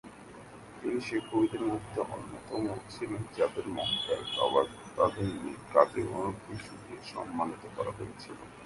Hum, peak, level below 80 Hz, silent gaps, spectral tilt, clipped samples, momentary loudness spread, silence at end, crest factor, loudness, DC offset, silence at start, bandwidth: none; -6 dBFS; -60 dBFS; none; -5.5 dB/octave; under 0.1%; 16 LU; 0 s; 26 dB; -33 LUFS; under 0.1%; 0.05 s; 11.5 kHz